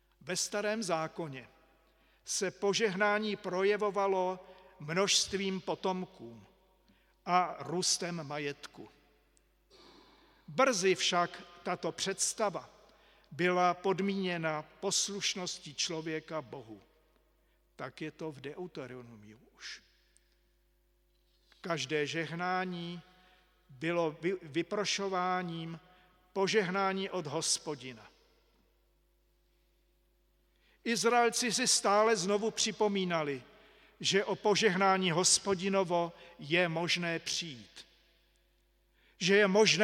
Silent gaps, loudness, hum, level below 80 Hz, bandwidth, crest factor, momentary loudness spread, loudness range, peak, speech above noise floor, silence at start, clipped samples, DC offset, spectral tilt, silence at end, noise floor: none; -32 LUFS; none; -72 dBFS; 16 kHz; 24 dB; 18 LU; 12 LU; -10 dBFS; 39 dB; 0.25 s; under 0.1%; under 0.1%; -3 dB/octave; 0 s; -72 dBFS